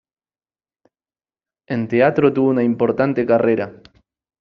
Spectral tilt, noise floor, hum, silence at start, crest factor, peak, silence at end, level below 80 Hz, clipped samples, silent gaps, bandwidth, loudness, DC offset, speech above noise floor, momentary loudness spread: -7 dB/octave; under -90 dBFS; none; 1.7 s; 18 dB; -2 dBFS; 0.65 s; -60 dBFS; under 0.1%; none; 6 kHz; -17 LUFS; under 0.1%; over 73 dB; 9 LU